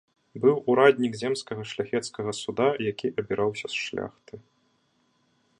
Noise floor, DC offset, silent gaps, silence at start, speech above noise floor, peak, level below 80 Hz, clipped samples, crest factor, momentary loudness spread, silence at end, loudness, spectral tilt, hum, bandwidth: -69 dBFS; under 0.1%; none; 0.35 s; 43 dB; -4 dBFS; -66 dBFS; under 0.1%; 24 dB; 13 LU; 1.2 s; -26 LUFS; -5 dB/octave; none; 10.5 kHz